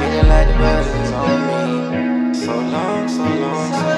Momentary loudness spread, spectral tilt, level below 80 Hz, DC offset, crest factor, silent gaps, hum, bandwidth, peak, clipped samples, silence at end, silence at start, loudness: 6 LU; -6.5 dB/octave; -20 dBFS; under 0.1%; 16 dB; none; none; 10 kHz; 0 dBFS; under 0.1%; 0 s; 0 s; -17 LUFS